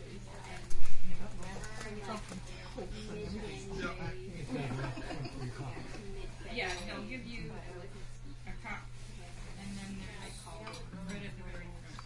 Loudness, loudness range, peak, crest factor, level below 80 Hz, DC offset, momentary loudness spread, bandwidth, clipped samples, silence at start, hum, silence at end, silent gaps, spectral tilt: -43 LUFS; 5 LU; -10 dBFS; 20 dB; -46 dBFS; under 0.1%; 9 LU; 11.5 kHz; under 0.1%; 0 s; none; 0 s; none; -5 dB/octave